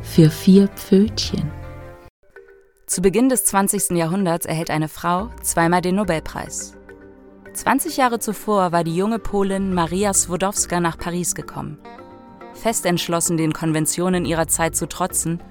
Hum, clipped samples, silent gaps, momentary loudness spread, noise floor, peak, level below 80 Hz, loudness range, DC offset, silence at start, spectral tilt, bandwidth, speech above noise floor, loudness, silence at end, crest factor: none; under 0.1%; 2.10-2.23 s; 12 LU; -48 dBFS; 0 dBFS; -42 dBFS; 3 LU; under 0.1%; 0 s; -4.5 dB/octave; 18 kHz; 29 dB; -19 LUFS; 0 s; 20 dB